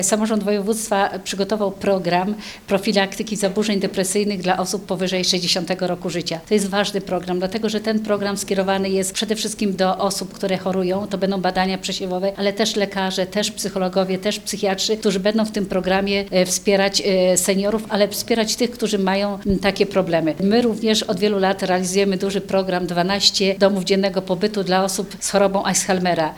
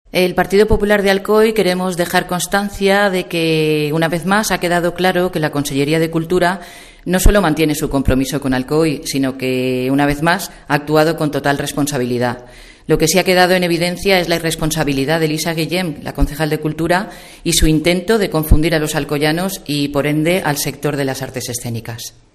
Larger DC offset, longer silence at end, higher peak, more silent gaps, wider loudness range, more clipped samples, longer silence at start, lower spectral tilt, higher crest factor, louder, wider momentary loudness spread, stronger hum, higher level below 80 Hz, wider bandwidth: neither; second, 0 s vs 0.25 s; about the same, 0 dBFS vs 0 dBFS; neither; about the same, 3 LU vs 2 LU; neither; second, 0 s vs 0.15 s; about the same, -4 dB/octave vs -4.5 dB/octave; about the same, 20 dB vs 16 dB; second, -20 LUFS vs -16 LUFS; about the same, 6 LU vs 7 LU; neither; second, -48 dBFS vs -28 dBFS; first, 19.5 kHz vs 15.5 kHz